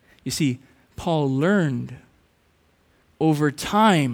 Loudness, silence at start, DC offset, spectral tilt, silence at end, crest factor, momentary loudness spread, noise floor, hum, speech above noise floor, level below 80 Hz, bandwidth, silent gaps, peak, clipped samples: -22 LUFS; 0.25 s; under 0.1%; -6 dB/octave; 0 s; 16 dB; 13 LU; -62 dBFS; none; 41 dB; -54 dBFS; 17.5 kHz; none; -6 dBFS; under 0.1%